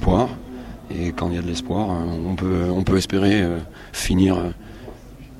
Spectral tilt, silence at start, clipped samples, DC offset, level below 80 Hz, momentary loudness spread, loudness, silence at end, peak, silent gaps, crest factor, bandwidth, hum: -6 dB/octave; 0 s; under 0.1%; under 0.1%; -34 dBFS; 18 LU; -22 LUFS; 0 s; -4 dBFS; none; 18 dB; 15.5 kHz; none